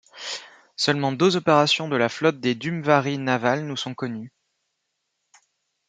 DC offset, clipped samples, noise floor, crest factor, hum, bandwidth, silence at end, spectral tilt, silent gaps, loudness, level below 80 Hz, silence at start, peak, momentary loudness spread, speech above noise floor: under 0.1%; under 0.1%; -77 dBFS; 22 dB; none; 9.4 kHz; 1.6 s; -5 dB/octave; none; -22 LUFS; -70 dBFS; 0.15 s; -2 dBFS; 14 LU; 55 dB